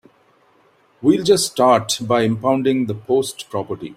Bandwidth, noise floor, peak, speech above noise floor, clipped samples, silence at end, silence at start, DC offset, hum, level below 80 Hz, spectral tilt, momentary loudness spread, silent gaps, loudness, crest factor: 16 kHz; -56 dBFS; -2 dBFS; 39 dB; under 0.1%; 0.05 s; 1 s; under 0.1%; none; -58 dBFS; -4.5 dB/octave; 11 LU; none; -18 LUFS; 16 dB